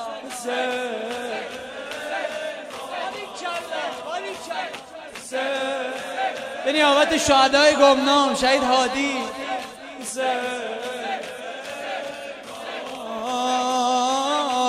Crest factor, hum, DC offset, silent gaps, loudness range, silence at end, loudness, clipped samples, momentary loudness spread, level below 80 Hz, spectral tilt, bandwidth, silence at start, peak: 20 dB; none; under 0.1%; none; 12 LU; 0 s; -23 LUFS; under 0.1%; 16 LU; -56 dBFS; -2 dB/octave; 15.5 kHz; 0 s; -4 dBFS